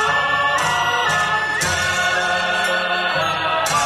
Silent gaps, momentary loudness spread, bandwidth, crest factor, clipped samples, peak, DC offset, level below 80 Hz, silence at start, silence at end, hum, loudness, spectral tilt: none; 2 LU; 16 kHz; 12 dB; under 0.1%; -6 dBFS; under 0.1%; -50 dBFS; 0 s; 0 s; none; -18 LUFS; -1.5 dB/octave